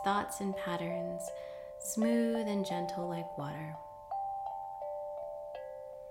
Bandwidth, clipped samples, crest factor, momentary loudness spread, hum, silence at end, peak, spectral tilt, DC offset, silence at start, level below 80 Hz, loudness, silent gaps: 17 kHz; under 0.1%; 16 dB; 13 LU; none; 0 s; -20 dBFS; -5 dB/octave; under 0.1%; 0 s; -68 dBFS; -37 LUFS; none